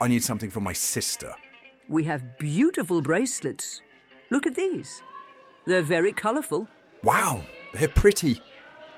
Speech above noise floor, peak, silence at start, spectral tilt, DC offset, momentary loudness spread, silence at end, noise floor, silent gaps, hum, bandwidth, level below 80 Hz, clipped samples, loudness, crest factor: 23 dB; -6 dBFS; 0 s; -4.5 dB/octave; under 0.1%; 17 LU; 0 s; -48 dBFS; none; none; 16.5 kHz; -40 dBFS; under 0.1%; -25 LUFS; 20 dB